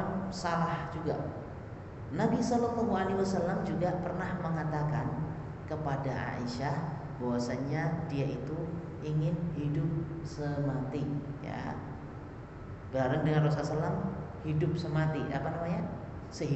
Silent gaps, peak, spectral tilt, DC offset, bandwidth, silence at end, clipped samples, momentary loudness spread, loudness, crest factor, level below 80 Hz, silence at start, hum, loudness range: none; -16 dBFS; -7.5 dB/octave; under 0.1%; 8.2 kHz; 0 s; under 0.1%; 11 LU; -34 LUFS; 16 dB; -54 dBFS; 0 s; none; 3 LU